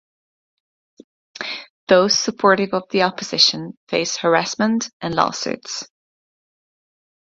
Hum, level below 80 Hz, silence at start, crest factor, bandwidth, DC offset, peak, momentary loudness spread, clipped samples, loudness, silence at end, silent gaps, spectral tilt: none; -62 dBFS; 1.4 s; 22 dB; 7.8 kHz; under 0.1%; 0 dBFS; 14 LU; under 0.1%; -18 LUFS; 1.4 s; 1.70-1.87 s, 3.77-3.87 s, 4.93-5.00 s; -3 dB/octave